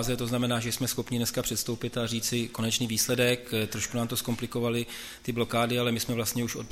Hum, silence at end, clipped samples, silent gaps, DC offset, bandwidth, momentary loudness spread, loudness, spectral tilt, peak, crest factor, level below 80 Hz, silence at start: none; 0 s; under 0.1%; none; under 0.1%; 16 kHz; 6 LU; -29 LUFS; -4 dB/octave; -12 dBFS; 18 dB; -54 dBFS; 0 s